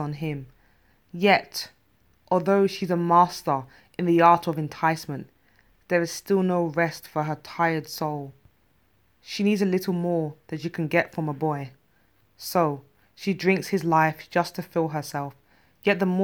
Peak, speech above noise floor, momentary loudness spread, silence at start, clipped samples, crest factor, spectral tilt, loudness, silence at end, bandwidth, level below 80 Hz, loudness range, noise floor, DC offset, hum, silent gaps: -4 dBFS; 41 dB; 14 LU; 0 s; under 0.1%; 20 dB; -6 dB/octave; -25 LUFS; 0 s; 19 kHz; -66 dBFS; 5 LU; -65 dBFS; under 0.1%; none; none